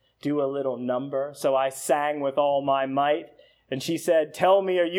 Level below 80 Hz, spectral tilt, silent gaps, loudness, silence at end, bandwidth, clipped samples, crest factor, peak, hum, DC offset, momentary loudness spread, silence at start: -76 dBFS; -4.5 dB/octave; none; -25 LUFS; 0 s; 19 kHz; under 0.1%; 16 dB; -8 dBFS; none; under 0.1%; 8 LU; 0.25 s